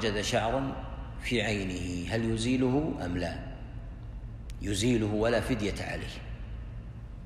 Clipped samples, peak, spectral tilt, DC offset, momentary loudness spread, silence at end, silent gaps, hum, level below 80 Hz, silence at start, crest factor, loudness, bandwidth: under 0.1%; -14 dBFS; -5.5 dB/octave; under 0.1%; 16 LU; 0 s; none; none; -42 dBFS; 0 s; 16 dB; -31 LUFS; 14 kHz